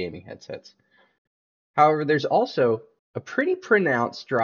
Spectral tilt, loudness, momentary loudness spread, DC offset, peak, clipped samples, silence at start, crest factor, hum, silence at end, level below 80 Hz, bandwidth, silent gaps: -4 dB/octave; -22 LUFS; 19 LU; under 0.1%; -2 dBFS; under 0.1%; 0 s; 22 dB; none; 0 s; -70 dBFS; 7 kHz; 1.18-1.74 s, 2.99-3.14 s